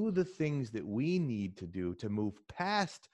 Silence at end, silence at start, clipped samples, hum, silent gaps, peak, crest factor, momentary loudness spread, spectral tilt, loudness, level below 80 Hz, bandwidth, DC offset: 0.15 s; 0 s; under 0.1%; none; none; -18 dBFS; 18 dB; 7 LU; -6.5 dB/octave; -36 LUFS; -68 dBFS; 10.5 kHz; under 0.1%